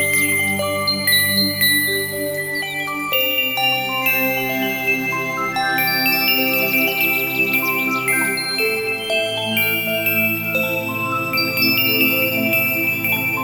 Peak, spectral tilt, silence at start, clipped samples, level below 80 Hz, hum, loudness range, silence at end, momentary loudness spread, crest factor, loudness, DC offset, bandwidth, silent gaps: -4 dBFS; -2.5 dB/octave; 0 s; under 0.1%; -56 dBFS; none; 2 LU; 0 s; 6 LU; 16 dB; -17 LUFS; under 0.1%; over 20 kHz; none